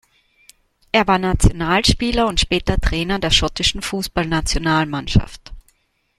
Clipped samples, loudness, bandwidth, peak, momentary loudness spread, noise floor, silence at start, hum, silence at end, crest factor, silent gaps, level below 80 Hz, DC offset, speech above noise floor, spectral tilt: under 0.1%; -18 LUFS; 14.5 kHz; 0 dBFS; 5 LU; -61 dBFS; 0.95 s; none; 0.6 s; 18 dB; none; -26 dBFS; under 0.1%; 44 dB; -4 dB/octave